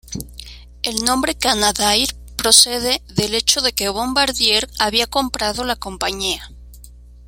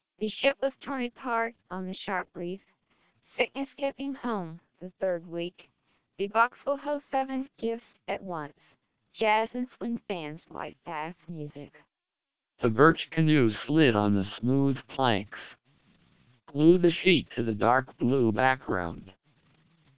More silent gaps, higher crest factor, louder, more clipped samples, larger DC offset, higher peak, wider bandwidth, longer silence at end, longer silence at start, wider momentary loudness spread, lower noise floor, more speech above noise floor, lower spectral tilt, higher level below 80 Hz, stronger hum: neither; about the same, 20 dB vs 24 dB; first, -16 LUFS vs -28 LUFS; neither; neither; first, 0 dBFS vs -6 dBFS; first, 17 kHz vs 4 kHz; second, 0 s vs 0.85 s; second, 0.05 s vs 0.2 s; second, 12 LU vs 17 LU; second, -41 dBFS vs -89 dBFS; second, 23 dB vs 61 dB; second, -1.5 dB/octave vs -4.5 dB/octave; first, -38 dBFS vs -60 dBFS; first, 60 Hz at -40 dBFS vs none